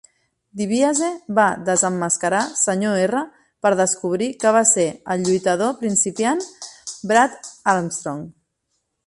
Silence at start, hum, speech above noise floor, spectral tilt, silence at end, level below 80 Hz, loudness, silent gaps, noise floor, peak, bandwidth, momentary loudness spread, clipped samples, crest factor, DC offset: 0.55 s; none; 54 dB; -3.5 dB/octave; 0.75 s; -64 dBFS; -19 LUFS; none; -73 dBFS; -2 dBFS; 11.5 kHz; 13 LU; under 0.1%; 18 dB; under 0.1%